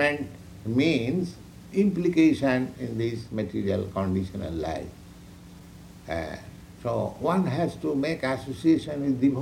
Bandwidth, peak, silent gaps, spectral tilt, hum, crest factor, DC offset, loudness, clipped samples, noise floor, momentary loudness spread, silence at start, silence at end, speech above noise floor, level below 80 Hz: 15 kHz; -8 dBFS; none; -7 dB/octave; none; 18 dB; under 0.1%; -27 LUFS; under 0.1%; -46 dBFS; 22 LU; 0 s; 0 s; 20 dB; -52 dBFS